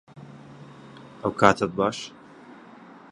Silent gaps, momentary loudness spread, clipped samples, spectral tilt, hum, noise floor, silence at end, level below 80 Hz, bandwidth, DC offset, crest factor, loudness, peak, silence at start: none; 27 LU; under 0.1%; -5 dB/octave; none; -47 dBFS; 0.6 s; -58 dBFS; 11.5 kHz; under 0.1%; 28 dB; -23 LUFS; 0 dBFS; 0.15 s